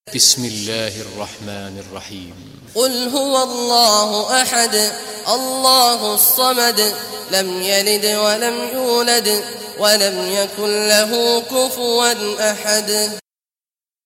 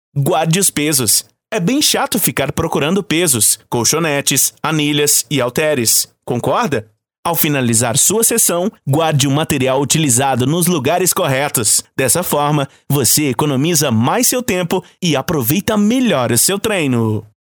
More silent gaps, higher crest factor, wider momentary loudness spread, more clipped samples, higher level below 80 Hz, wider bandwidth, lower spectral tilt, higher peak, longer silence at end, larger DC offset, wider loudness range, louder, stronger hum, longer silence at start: second, none vs 7.18-7.23 s; about the same, 18 dB vs 14 dB; first, 16 LU vs 6 LU; neither; second, -60 dBFS vs -48 dBFS; second, 16.5 kHz vs over 20 kHz; second, -1 dB/octave vs -3.5 dB/octave; about the same, 0 dBFS vs 0 dBFS; first, 0.85 s vs 0.2 s; neither; first, 4 LU vs 1 LU; about the same, -15 LUFS vs -14 LUFS; neither; about the same, 0.05 s vs 0.15 s